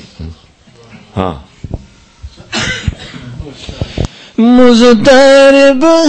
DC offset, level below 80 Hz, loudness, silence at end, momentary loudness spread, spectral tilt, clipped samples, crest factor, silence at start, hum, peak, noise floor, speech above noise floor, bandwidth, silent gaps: under 0.1%; -30 dBFS; -7 LUFS; 0 s; 24 LU; -5 dB/octave; 0.9%; 10 dB; 0.2 s; none; 0 dBFS; -41 dBFS; 36 dB; 9.2 kHz; none